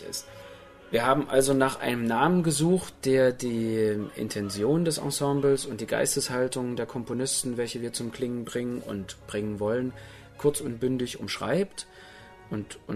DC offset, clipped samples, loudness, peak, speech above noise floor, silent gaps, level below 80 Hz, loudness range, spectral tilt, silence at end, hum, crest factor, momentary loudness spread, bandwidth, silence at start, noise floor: under 0.1%; under 0.1%; -27 LUFS; -8 dBFS; 22 dB; none; -56 dBFS; 6 LU; -4.5 dB/octave; 0 s; none; 20 dB; 13 LU; 13.5 kHz; 0 s; -49 dBFS